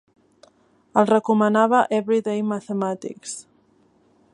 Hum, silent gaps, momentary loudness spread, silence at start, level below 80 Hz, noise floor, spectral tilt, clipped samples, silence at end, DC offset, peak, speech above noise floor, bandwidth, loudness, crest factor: none; none; 15 LU; 0.95 s; -72 dBFS; -60 dBFS; -5.5 dB/octave; under 0.1%; 0.9 s; under 0.1%; -2 dBFS; 39 dB; 11.5 kHz; -21 LUFS; 20 dB